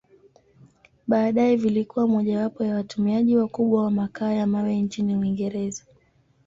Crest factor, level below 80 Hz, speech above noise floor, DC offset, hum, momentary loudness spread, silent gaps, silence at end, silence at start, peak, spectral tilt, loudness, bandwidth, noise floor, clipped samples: 16 dB; -62 dBFS; 40 dB; under 0.1%; none; 7 LU; none; 0.7 s; 1.05 s; -8 dBFS; -7.5 dB/octave; -23 LUFS; 7.6 kHz; -62 dBFS; under 0.1%